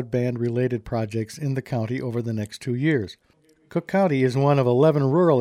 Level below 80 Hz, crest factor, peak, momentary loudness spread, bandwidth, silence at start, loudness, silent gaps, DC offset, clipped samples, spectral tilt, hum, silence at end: -56 dBFS; 16 dB; -6 dBFS; 10 LU; 13.5 kHz; 0 s; -23 LUFS; none; under 0.1%; under 0.1%; -8 dB/octave; none; 0 s